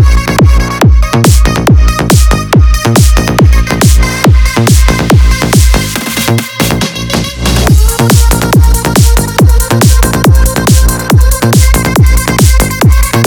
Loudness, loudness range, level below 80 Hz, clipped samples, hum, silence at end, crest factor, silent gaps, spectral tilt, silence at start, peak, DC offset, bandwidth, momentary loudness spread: -7 LUFS; 2 LU; -8 dBFS; 2%; none; 0 s; 6 dB; none; -5 dB/octave; 0 s; 0 dBFS; under 0.1%; over 20 kHz; 4 LU